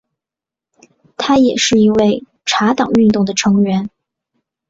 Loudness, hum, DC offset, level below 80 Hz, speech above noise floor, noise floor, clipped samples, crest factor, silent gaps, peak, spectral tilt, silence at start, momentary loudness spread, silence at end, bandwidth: -13 LUFS; none; under 0.1%; -50 dBFS; 75 dB; -87 dBFS; under 0.1%; 12 dB; none; -2 dBFS; -4.5 dB/octave; 1.2 s; 9 LU; 0.8 s; 7.8 kHz